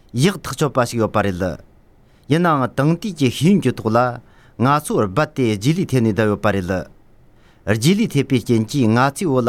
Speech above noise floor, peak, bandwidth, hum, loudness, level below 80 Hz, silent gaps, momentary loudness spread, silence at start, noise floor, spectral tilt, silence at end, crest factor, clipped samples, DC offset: 33 dB; -2 dBFS; 16 kHz; none; -18 LUFS; -48 dBFS; none; 7 LU; 0.15 s; -50 dBFS; -6 dB/octave; 0 s; 16 dB; under 0.1%; under 0.1%